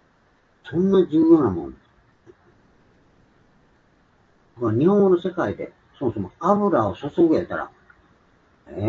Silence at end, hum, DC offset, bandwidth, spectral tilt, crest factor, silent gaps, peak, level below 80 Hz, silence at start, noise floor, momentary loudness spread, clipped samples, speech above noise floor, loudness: 0 s; none; under 0.1%; 6.6 kHz; -9.5 dB/octave; 20 dB; none; -4 dBFS; -56 dBFS; 0.65 s; -60 dBFS; 16 LU; under 0.1%; 41 dB; -21 LUFS